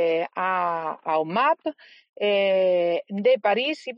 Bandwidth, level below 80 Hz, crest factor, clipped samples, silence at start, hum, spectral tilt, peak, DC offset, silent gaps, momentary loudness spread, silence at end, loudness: 7.4 kHz; -78 dBFS; 12 dB; under 0.1%; 0 s; none; -6 dB/octave; -10 dBFS; under 0.1%; 2.09-2.13 s; 7 LU; 0 s; -23 LUFS